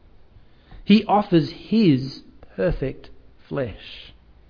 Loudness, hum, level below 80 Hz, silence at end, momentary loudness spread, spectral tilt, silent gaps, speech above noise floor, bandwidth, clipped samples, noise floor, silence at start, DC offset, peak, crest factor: -21 LUFS; none; -42 dBFS; 0.5 s; 22 LU; -8.5 dB/octave; none; 29 dB; 5.4 kHz; under 0.1%; -49 dBFS; 0.7 s; under 0.1%; -2 dBFS; 20 dB